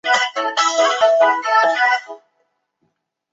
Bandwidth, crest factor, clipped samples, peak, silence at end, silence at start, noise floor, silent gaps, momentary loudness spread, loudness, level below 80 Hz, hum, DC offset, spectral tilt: 8 kHz; 16 dB; under 0.1%; -2 dBFS; 1.15 s; 0.05 s; -69 dBFS; none; 4 LU; -16 LUFS; -74 dBFS; none; under 0.1%; 0.5 dB/octave